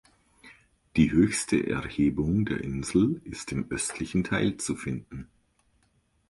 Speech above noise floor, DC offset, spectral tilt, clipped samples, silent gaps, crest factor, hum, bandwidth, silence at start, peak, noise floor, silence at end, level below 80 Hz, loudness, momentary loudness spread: 42 dB; under 0.1%; -5.5 dB/octave; under 0.1%; none; 20 dB; none; 11.5 kHz; 0.45 s; -8 dBFS; -69 dBFS; 1.05 s; -48 dBFS; -27 LUFS; 11 LU